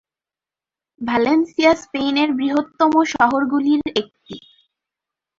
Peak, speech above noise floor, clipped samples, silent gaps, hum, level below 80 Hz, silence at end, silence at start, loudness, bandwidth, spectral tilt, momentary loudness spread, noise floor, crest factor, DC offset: -2 dBFS; 72 dB; under 0.1%; none; none; -56 dBFS; 1 s; 1 s; -18 LUFS; 7.6 kHz; -4.5 dB/octave; 16 LU; -90 dBFS; 18 dB; under 0.1%